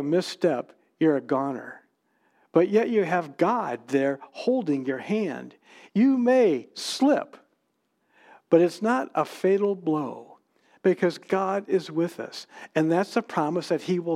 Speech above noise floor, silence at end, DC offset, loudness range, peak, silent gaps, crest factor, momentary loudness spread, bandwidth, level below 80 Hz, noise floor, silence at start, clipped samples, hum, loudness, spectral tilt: 49 dB; 0 s; under 0.1%; 2 LU; -6 dBFS; none; 20 dB; 11 LU; 14.5 kHz; -86 dBFS; -74 dBFS; 0 s; under 0.1%; none; -25 LUFS; -6 dB/octave